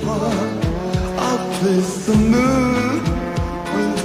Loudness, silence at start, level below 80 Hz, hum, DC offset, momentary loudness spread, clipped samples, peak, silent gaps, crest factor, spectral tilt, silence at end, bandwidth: -19 LUFS; 0 s; -32 dBFS; none; under 0.1%; 7 LU; under 0.1%; -4 dBFS; none; 14 dB; -6 dB/octave; 0 s; 15.5 kHz